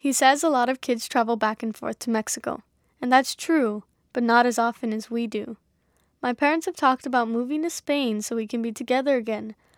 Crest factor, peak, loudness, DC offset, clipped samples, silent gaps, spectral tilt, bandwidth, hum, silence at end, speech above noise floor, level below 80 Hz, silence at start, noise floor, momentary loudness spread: 20 dB; -4 dBFS; -24 LUFS; under 0.1%; under 0.1%; none; -3 dB/octave; 18 kHz; none; 0.25 s; 44 dB; -70 dBFS; 0.05 s; -67 dBFS; 12 LU